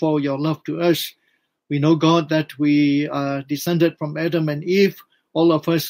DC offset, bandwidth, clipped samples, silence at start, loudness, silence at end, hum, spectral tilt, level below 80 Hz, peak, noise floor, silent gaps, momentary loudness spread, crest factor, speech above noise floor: under 0.1%; 16 kHz; under 0.1%; 0 s; -20 LUFS; 0 s; none; -6.5 dB/octave; -66 dBFS; -4 dBFS; -67 dBFS; none; 8 LU; 14 dB; 49 dB